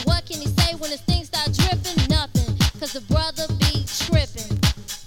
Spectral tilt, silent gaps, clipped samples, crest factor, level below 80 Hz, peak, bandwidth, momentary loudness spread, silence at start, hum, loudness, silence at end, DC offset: -4.5 dB/octave; none; under 0.1%; 16 dB; -28 dBFS; -6 dBFS; 17.5 kHz; 4 LU; 0 s; none; -22 LUFS; 0 s; under 0.1%